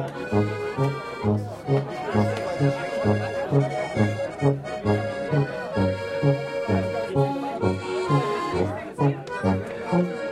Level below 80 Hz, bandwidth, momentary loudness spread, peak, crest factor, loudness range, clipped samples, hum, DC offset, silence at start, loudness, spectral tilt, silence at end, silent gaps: -52 dBFS; 11.5 kHz; 3 LU; -8 dBFS; 18 dB; 1 LU; under 0.1%; none; under 0.1%; 0 s; -25 LUFS; -7.5 dB/octave; 0 s; none